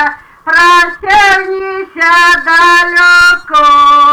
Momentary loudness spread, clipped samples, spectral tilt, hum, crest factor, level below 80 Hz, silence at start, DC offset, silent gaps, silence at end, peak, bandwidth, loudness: 11 LU; under 0.1%; -1 dB/octave; none; 6 dB; -40 dBFS; 0 s; 0.6%; none; 0 s; -2 dBFS; 19.5 kHz; -6 LUFS